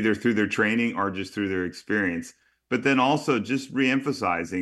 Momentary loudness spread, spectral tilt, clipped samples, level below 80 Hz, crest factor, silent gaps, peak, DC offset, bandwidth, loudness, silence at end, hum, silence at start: 8 LU; -5.5 dB/octave; under 0.1%; -64 dBFS; 16 dB; none; -8 dBFS; under 0.1%; 12.5 kHz; -25 LUFS; 0 s; none; 0 s